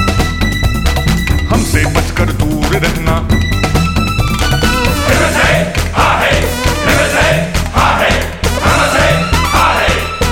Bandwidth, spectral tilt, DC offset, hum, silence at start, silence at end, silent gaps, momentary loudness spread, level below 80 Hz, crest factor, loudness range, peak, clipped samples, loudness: 17.5 kHz; -4.5 dB/octave; under 0.1%; none; 0 s; 0 s; none; 4 LU; -18 dBFS; 12 dB; 2 LU; 0 dBFS; under 0.1%; -12 LUFS